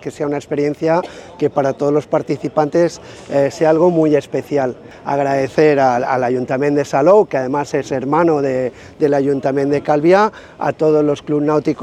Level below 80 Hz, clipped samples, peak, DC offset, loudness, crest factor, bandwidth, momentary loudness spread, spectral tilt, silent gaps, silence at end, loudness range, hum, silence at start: -54 dBFS; under 0.1%; 0 dBFS; under 0.1%; -16 LUFS; 16 dB; 10 kHz; 9 LU; -7 dB/octave; none; 0 s; 2 LU; none; 0 s